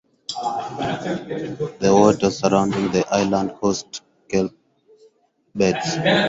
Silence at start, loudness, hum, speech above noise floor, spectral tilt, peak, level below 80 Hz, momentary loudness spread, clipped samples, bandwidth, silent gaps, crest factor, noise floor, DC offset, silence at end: 0.3 s; -21 LUFS; none; 39 dB; -5 dB/octave; -2 dBFS; -52 dBFS; 12 LU; under 0.1%; 8 kHz; none; 18 dB; -59 dBFS; under 0.1%; 0 s